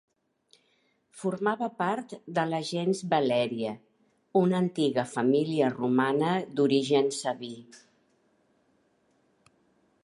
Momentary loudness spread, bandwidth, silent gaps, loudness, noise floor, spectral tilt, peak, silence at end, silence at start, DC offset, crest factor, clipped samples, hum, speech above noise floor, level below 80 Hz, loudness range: 10 LU; 11.5 kHz; none; -28 LUFS; -70 dBFS; -6 dB/octave; -10 dBFS; 2.25 s; 1.15 s; under 0.1%; 18 dB; under 0.1%; none; 43 dB; -78 dBFS; 5 LU